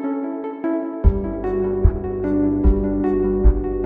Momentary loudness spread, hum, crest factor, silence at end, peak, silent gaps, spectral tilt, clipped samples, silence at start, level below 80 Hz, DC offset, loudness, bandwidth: 7 LU; none; 16 dB; 0 s; -2 dBFS; none; -12.5 dB/octave; under 0.1%; 0 s; -22 dBFS; under 0.1%; -21 LUFS; 2.8 kHz